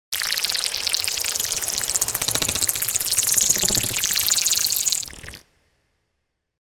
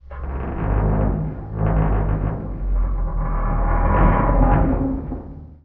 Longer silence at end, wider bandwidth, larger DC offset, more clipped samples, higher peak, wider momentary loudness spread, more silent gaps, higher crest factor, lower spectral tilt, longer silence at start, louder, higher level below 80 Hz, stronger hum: first, 1.25 s vs 0.1 s; first, 16 kHz vs 3.1 kHz; neither; neither; about the same, -2 dBFS vs -2 dBFS; second, 5 LU vs 11 LU; neither; first, 22 dB vs 16 dB; second, 0.5 dB/octave vs -9.5 dB/octave; about the same, 0.1 s vs 0.05 s; about the same, -20 LUFS vs -21 LUFS; second, -48 dBFS vs -22 dBFS; neither